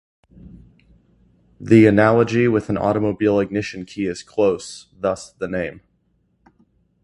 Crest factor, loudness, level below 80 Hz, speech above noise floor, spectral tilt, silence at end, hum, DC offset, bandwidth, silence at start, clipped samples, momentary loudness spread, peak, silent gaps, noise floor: 20 dB; -19 LUFS; -50 dBFS; 46 dB; -7 dB/octave; 1.3 s; none; under 0.1%; 11 kHz; 0.45 s; under 0.1%; 15 LU; 0 dBFS; none; -65 dBFS